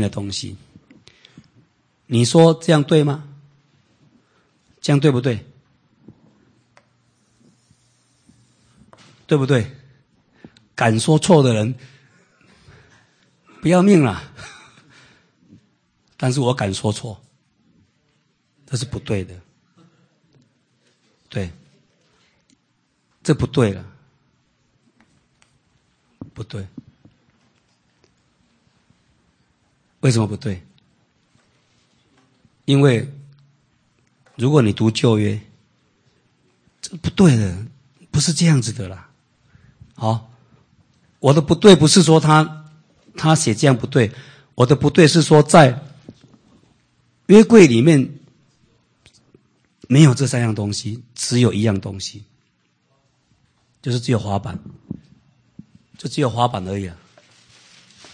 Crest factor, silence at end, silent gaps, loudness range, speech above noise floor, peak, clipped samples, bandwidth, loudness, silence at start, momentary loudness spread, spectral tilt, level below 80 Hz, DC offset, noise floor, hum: 20 dB; 1.2 s; none; 13 LU; 51 dB; 0 dBFS; under 0.1%; 9.8 kHz; -16 LUFS; 0 s; 22 LU; -6 dB/octave; -52 dBFS; under 0.1%; -66 dBFS; none